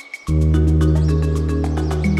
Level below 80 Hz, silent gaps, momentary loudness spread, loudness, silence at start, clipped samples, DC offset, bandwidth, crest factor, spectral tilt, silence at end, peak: -20 dBFS; none; 5 LU; -18 LUFS; 0.05 s; under 0.1%; under 0.1%; 10.5 kHz; 12 dB; -8 dB/octave; 0 s; -6 dBFS